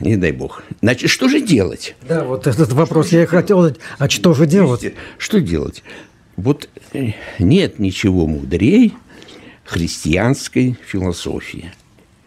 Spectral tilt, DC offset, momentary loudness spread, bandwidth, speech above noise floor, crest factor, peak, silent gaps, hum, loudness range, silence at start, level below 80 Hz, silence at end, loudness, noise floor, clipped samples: -6 dB/octave; under 0.1%; 14 LU; 15 kHz; 24 dB; 14 dB; -2 dBFS; none; none; 4 LU; 0 s; -38 dBFS; 0.55 s; -16 LUFS; -40 dBFS; under 0.1%